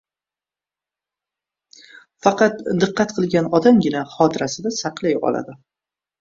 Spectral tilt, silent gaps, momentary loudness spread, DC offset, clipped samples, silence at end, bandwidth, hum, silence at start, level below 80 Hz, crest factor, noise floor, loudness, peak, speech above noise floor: -5.5 dB/octave; none; 9 LU; under 0.1%; under 0.1%; 0.65 s; 7.6 kHz; none; 2.25 s; -58 dBFS; 20 dB; under -90 dBFS; -19 LUFS; 0 dBFS; over 72 dB